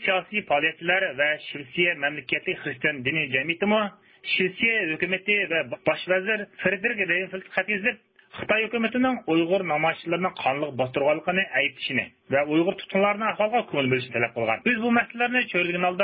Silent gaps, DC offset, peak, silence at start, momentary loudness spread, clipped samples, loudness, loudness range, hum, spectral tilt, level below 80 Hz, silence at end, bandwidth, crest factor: none; under 0.1%; -8 dBFS; 0 s; 5 LU; under 0.1%; -24 LUFS; 1 LU; none; -9.5 dB/octave; -64 dBFS; 0 s; 5.2 kHz; 18 dB